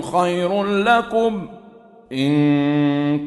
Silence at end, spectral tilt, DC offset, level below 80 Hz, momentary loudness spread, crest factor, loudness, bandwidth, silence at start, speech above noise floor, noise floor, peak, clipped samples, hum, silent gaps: 0 s; -7 dB/octave; under 0.1%; -56 dBFS; 10 LU; 16 dB; -18 LUFS; 11.5 kHz; 0 s; 27 dB; -45 dBFS; -2 dBFS; under 0.1%; none; none